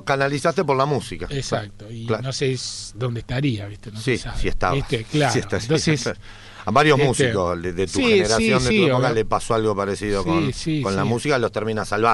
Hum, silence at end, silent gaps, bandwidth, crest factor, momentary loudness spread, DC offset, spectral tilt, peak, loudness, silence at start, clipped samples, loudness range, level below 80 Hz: none; 0 s; none; 11.5 kHz; 18 dB; 11 LU; under 0.1%; -5 dB/octave; -4 dBFS; -21 LUFS; 0 s; under 0.1%; 7 LU; -38 dBFS